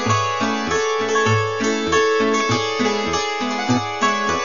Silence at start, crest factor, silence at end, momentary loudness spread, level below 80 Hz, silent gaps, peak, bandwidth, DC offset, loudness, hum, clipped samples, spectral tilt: 0 s; 14 dB; 0 s; 4 LU; -50 dBFS; none; -4 dBFS; 7.4 kHz; 0.7%; -19 LUFS; none; under 0.1%; -4 dB/octave